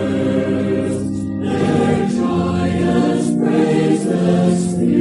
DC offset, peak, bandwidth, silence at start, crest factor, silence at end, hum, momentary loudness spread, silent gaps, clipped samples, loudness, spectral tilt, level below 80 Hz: under 0.1%; -2 dBFS; 11.5 kHz; 0 s; 12 dB; 0 s; none; 5 LU; none; under 0.1%; -17 LUFS; -7 dB/octave; -40 dBFS